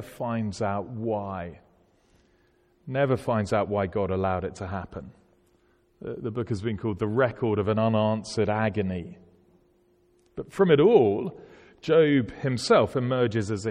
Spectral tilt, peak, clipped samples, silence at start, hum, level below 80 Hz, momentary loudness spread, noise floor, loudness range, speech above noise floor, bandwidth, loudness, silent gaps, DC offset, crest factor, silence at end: -7 dB/octave; -6 dBFS; under 0.1%; 0 s; none; -56 dBFS; 16 LU; -64 dBFS; 8 LU; 39 dB; 11 kHz; -25 LUFS; none; under 0.1%; 20 dB; 0 s